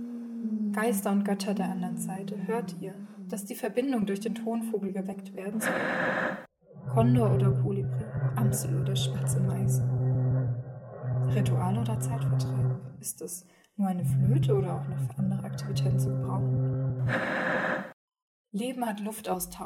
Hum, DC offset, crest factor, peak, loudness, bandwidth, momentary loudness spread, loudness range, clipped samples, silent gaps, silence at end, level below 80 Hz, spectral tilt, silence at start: none; under 0.1%; 18 dB; -12 dBFS; -29 LUFS; 16 kHz; 11 LU; 4 LU; under 0.1%; 17.93-18.08 s, 18.22-18.45 s; 0 s; -58 dBFS; -6.5 dB/octave; 0 s